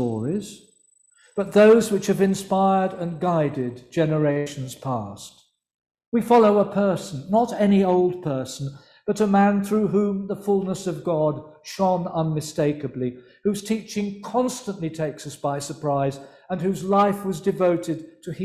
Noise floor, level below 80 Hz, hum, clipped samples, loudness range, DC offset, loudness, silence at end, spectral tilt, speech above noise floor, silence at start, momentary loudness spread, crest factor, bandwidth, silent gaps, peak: -60 dBFS; -60 dBFS; none; under 0.1%; 6 LU; under 0.1%; -22 LUFS; 0 s; -6.5 dB/octave; 38 dB; 0 s; 13 LU; 18 dB; 14.5 kHz; 5.74-5.78 s, 6.07-6.12 s; -4 dBFS